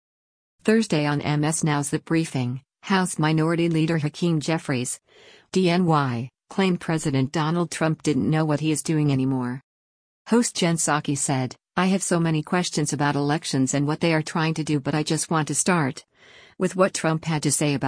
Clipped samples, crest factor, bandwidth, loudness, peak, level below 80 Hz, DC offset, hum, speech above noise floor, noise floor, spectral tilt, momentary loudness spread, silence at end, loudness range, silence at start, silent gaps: under 0.1%; 18 dB; 10.5 kHz; -23 LUFS; -6 dBFS; -60 dBFS; under 0.1%; none; 23 dB; -45 dBFS; -5 dB/octave; 6 LU; 0 s; 1 LU; 0.65 s; 9.63-10.25 s